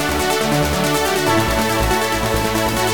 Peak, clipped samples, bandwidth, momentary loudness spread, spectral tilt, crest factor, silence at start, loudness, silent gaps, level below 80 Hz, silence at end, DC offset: -2 dBFS; under 0.1%; 19.5 kHz; 2 LU; -4 dB/octave; 16 dB; 0 s; -17 LUFS; none; -30 dBFS; 0 s; 1%